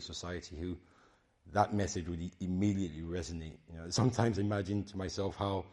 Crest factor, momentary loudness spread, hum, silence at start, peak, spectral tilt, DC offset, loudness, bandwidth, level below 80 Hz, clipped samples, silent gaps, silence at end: 22 dB; 12 LU; none; 0 s; -12 dBFS; -6 dB/octave; under 0.1%; -36 LUFS; 11.5 kHz; -58 dBFS; under 0.1%; none; 0 s